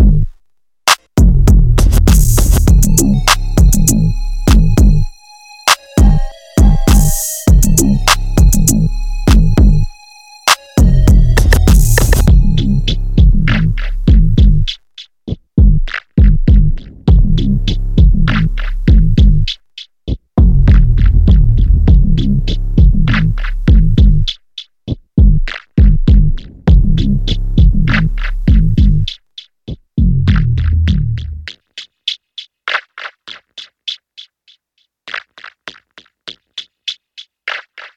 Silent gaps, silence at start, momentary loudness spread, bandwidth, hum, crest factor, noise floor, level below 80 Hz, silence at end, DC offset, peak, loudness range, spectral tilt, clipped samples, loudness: none; 0 s; 16 LU; 17.5 kHz; none; 10 dB; -64 dBFS; -12 dBFS; 0.1 s; under 0.1%; 0 dBFS; 13 LU; -5 dB/octave; 0.1%; -12 LUFS